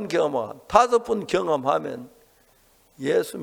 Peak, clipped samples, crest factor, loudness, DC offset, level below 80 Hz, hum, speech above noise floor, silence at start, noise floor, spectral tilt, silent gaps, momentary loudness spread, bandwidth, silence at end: 0 dBFS; under 0.1%; 24 dB; -23 LUFS; under 0.1%; -56 dBFS; none; 36 dB; 0 s; -59 dBFS; -5 dB/octave; none; 13 LU; 18.5 kHz; 0 s